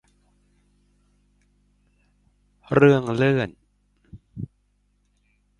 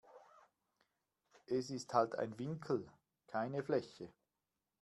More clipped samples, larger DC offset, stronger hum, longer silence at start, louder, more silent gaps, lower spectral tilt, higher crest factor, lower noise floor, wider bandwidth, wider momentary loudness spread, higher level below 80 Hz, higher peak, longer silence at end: neither; neither; first, 50 Hz at -55 dBFS vs none; first, 2.7 s vs 0.1 s; first, -20 LUFS vs -40 LUFS; neither; first, -8 dB/octave vs -6 dB/octave; about the same, 24 dB vs 24 dB; second, -67 dBFS vs under -90 dBFS; second, 10.5 kHz vs 12 kHz; first, 22 LU vs 18 LU; first, -56 dBFS vs -82 dBFS; first, -2 dBFS vs -18 dBFS; first, 1.15 s vs 0.7 s